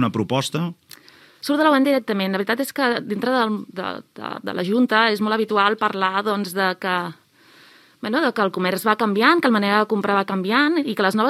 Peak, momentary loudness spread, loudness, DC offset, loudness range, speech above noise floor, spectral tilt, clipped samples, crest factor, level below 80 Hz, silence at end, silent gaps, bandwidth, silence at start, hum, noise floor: 0 dBFS; 12 LU; -20 LUFS; under 0.1%; 3 LU; 31 dB; -5 dB/octave; under 0.1%; 20 dB; -74 dBFS; 0 s; none; 15.5 kHz; 0 s; none; -51 dBFS